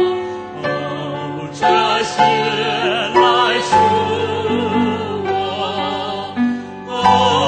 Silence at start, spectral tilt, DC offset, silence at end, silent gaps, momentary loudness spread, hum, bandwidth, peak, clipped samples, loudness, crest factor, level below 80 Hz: 0 s; -4.5 dB/octave; under 0.1%; 0 s; none; 11 LU; none; 9.2 kHz; 0 dBFS; under 0.1%; -17 LUFS; 16 dB; -54 dBFS